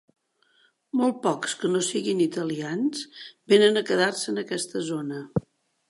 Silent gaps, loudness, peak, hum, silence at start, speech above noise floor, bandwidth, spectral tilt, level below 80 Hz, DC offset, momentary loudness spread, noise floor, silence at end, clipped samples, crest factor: none; -25 LUFS; -6 dBFS; none; 0.95 s; 40 dB; 11.5 kHz; -4 dB/octave; -66 dBFS; under 0.1%; 12 LU; -65 dBFS; 0.5 s; under 0.1%; 20 dB